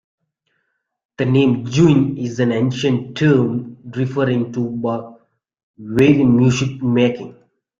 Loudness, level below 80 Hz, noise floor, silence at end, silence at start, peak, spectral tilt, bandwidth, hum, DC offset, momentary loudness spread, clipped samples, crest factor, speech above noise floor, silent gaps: -17 LUFS; -52 dBFS; -71 dBFS; 0.45 s; 1.2 s; -2 dBFS; -7 dB/octave; 7.6 kHz; none; under 0.1%; 11 LU; under 0.1%; 16 dB; 55 dB; 5.63-5.74 s